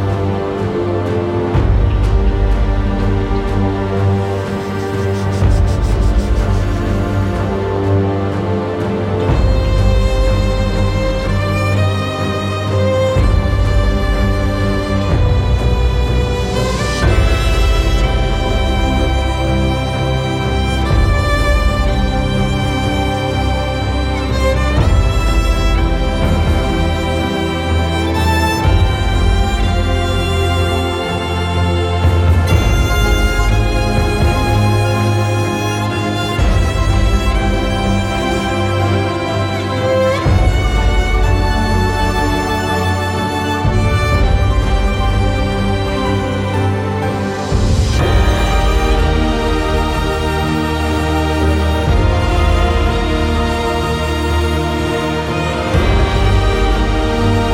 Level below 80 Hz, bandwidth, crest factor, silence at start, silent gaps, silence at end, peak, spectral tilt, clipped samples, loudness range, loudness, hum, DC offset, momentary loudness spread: -18 dBFS; 15 kHz; 12 dB; 0 s; none; 0 s; 0 dBFS; -6 dB/octave; under 0.1%; 1 LU; -15 LUFS; none; under 0.1%; 4 LU